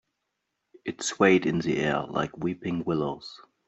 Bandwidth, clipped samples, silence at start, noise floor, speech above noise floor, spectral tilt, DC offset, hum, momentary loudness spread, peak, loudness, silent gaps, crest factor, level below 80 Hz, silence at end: 8.2 kHz; under 0.1%; 0.85 s; -81 dBFS; 54 dB; -5 dB/octave; under 0.1%; none; 17 LU; -6 dBFS; -26 LUFS; none; 22 dB; -60 dBFS; 0.3 s